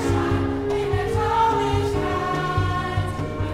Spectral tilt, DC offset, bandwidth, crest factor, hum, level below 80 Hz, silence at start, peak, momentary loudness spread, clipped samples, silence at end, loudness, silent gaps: -6.5 dB/octave; under 0.1%; 13.5 kHz; 12 dB; none; -36 dBFS; 0 s; -10 dBFS; 6 LU; under 0.1%; 0 s; -23 LUFS; none